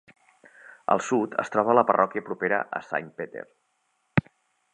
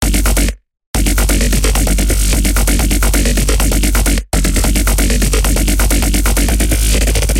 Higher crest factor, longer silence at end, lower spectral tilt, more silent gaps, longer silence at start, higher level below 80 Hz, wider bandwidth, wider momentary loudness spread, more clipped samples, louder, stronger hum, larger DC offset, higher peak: first, 24 dB vs 10 dB; first, 0.55 s vs 0 s; first, -6.5 dB/octave vs -4 dB/octave; second, none vs 0.86-0.94 s; first, 0.7 s vs 0 s; second, -62 dBFS vs -14 dBFS; second, 9.6 kHz vs 17 kHz; first, 16 LU vs 2 LU; neither; second, -25 LUFS vs -13 LUFS; neither; second, under 0.1% vs 0.4%; about the same, -4 dBFS vs -2 dBFS